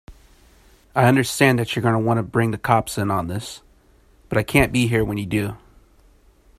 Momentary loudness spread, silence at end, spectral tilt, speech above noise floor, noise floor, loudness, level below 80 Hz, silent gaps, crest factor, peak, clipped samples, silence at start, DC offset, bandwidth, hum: 11 LU; 1 s; -5.5 dB/octave; 35 dB; -54 dBFS; -20 LUFS; -42 dBFS; none; 22 dB; 0 dBFS; under 0.1%; 0.1 s; under 0.1%; 15 kHz; none